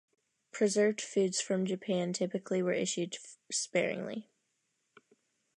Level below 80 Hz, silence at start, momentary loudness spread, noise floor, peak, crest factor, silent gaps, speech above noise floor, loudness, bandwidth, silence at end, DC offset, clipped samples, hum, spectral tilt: -84 dBFS; 0.55 s; 10 LU; -80 dBFS; -16 dBFS; 18 dB; none; 48 dB; -33 LUFS; 11.5 kHz; 1.35 s; under 0.1%; under 0.1%; none; -4 dB/octave